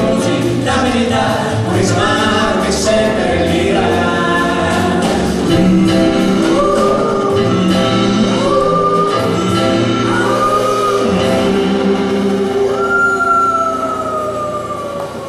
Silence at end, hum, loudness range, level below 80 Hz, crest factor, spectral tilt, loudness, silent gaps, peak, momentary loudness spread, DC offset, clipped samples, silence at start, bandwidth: 0 s; none; 1 LU; -36 dBFS; 12 dB; -5.5 dB/octave; -13 LUFS; none; -2 dBFS; 3 LU; under 0.1%; under 0.1%; 0 s; 14 kHz